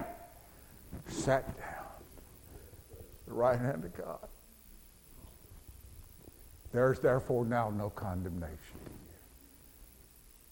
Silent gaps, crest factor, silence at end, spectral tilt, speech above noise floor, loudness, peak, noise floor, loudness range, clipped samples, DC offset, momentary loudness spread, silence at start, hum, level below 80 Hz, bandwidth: none; 22 dB; 0.15 s; -6.5 dB/octave; 26 dB; -34 LUFS; -14 dBFS; -59 dBFS; 6 LU; under 0.1%; under 0.1%; 26 LU; 0 s; none; -56 dBFS; 17 kHz